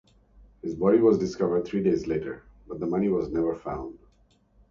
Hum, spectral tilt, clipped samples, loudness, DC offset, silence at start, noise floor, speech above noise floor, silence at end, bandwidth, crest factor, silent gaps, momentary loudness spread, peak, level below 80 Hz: none; -8 dB/octave; under 0.1%; -26 LUFS; under 0.1%; 0.65 s; -62 dBFS; 37 dB; 0.75 s; 7.2 kHz; 18 dB; none; 18 LU; -8 dBFS; -52 dBFS